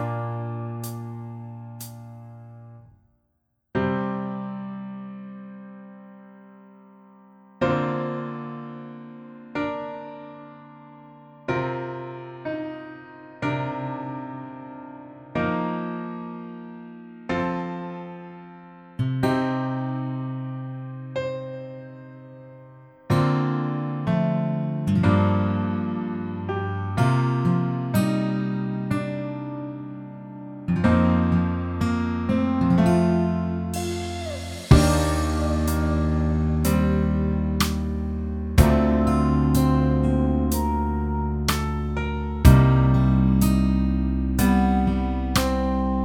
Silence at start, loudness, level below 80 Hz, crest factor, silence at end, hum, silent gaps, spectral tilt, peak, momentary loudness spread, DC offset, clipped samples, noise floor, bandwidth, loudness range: 0 s; -23 LUFS; -32 dBFS; 24 dB; 0 s; none; none; -7 dB/octave; 0 dBFS; 20 LU; under 0.1%; under 0.1%; -73 dBFS; 18 kHz; 12 LU